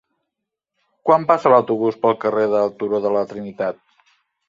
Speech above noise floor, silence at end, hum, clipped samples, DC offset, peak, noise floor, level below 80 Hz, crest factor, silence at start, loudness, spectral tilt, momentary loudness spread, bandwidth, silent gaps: 64 dB; 0.75 s; none; under 0.1%; under 0.1%; -2 dBFS; -81 dBFS; -66 dBFS; 18 dB; 1.05 s; -19 LUFS; -7.5 dB/octave; 11 LU; 7.4 kHz; none